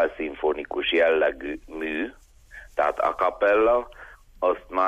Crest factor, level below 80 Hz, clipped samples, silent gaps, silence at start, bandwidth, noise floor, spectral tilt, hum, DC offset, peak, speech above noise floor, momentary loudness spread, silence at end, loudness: 14 dB; -50 dBFS; under 0.1%; none; 0 s; 10.5 kHz; -47 dBFS; -4.5 dB/octave; none; under 0.1%; -10 dBFS; 23 dB; 13 LU; 0 s; -24 LUFS